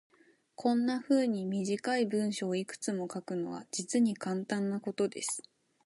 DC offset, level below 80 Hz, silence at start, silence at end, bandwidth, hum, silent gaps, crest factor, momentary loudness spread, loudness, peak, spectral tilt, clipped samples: under 0.1%; -80 dBFS; 0.6 s; 0.45 s; 11.5 kHz; none; none; 16 dB; 8 LU; -33 LUFS; -16 dBFS; -5 dB/octave; under 0.1%